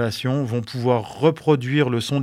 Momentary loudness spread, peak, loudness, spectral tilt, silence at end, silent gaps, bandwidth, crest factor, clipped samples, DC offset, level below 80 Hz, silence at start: 5 LU; -2 dBFS; -21 LUFS; -6.5 dB/octave; 0 s; none; 15.5 kHz; 18 dB; under 0.1%; under 0.1%; -60 dBFS; 0 s